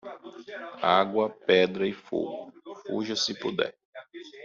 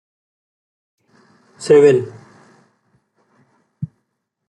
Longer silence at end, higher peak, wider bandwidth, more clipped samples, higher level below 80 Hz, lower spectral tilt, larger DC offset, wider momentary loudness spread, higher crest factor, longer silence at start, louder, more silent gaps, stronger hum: second, 0 s vs 0.65 s; second, -8 dBFS vs -2 dBFS; second, 7.6 kHz vs 11 kHz; neither; second, -72 dBFS vs -64 dBFS; second, -2.5 dB/octave vs -6.5 dB/octave; neither; about the same, 21 LU vs 22 LU; about the same, 22 dB vs 18 dB; second, 0.05 s vs 1.6 s; second, -27 LUFS vs -13 LUFS; first, 3.85-3.93 s vs none; neither